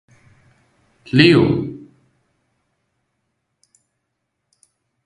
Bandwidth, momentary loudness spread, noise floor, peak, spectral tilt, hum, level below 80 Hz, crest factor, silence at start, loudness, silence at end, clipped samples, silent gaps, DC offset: 10.5 kHz; 20 LU; -75 dBFS; 0 dBFS; -7 dB/octave; none; -52 dBFS; 22 dB; 1.15 s; -14 LUFS; 3.3 s; under 0.1%; none; under 0.1%